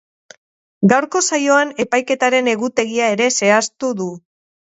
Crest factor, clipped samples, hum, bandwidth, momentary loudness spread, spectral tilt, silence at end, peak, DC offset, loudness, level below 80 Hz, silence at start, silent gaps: 18 dB; under 0.1%; none; 8.2 kHz; 8 LU; -3.5 dB/octave; 0.6 s; 0 dBFS; under 0.1%; -16 LUFS; -64 dBFS; 0.8 s; none